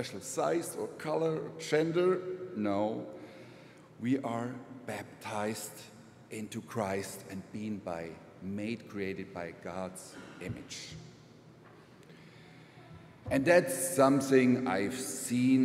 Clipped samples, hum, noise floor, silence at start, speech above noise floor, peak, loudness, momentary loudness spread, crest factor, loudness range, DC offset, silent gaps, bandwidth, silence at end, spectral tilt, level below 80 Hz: under 0.1%; none; -56 dBFS; 0 s; 24 dB; -12 dBFS; -33 LUFS; 22 LU; 22 dB; 14 LU; under 0.1%; none; 16 kHz; 0 s; -5 dB/octave; -68 dBFS